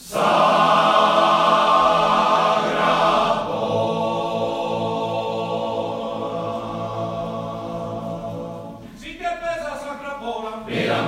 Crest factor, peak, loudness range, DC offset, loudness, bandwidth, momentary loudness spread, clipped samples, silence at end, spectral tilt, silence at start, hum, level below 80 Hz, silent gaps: 18 dB; -4 dBFS; 12 LU; under 0.1%; -20 LUFS; 15.5 kHz; 14 LU; under 0.1%; 0 s; -5 dB/octave; 0 s; none; -52 dBFS; none